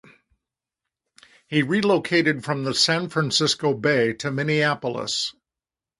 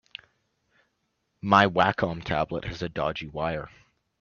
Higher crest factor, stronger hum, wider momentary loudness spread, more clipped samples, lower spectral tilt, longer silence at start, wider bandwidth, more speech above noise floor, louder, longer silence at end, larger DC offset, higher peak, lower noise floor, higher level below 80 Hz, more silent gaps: second, 18 dB vs 26 dB; neither; second, 6 LU vs 19 LU; neither; second, -4 dB/octave vs -6 dB/octave; about the same, 1.5 s vs 1.45 s; first, 11.5 kHz vs 7.2 kHz; first, over 68 dB vs 50 dB; first, -22 LUFS vs -26 LUFS; first, 0.7 s vs 0.55 s; neither; second, -6 dBFS vs -2 dBFS; first, under -90 dBFS vs -76 dBFS; second, -64 dBFS vs -52 dBFS; neither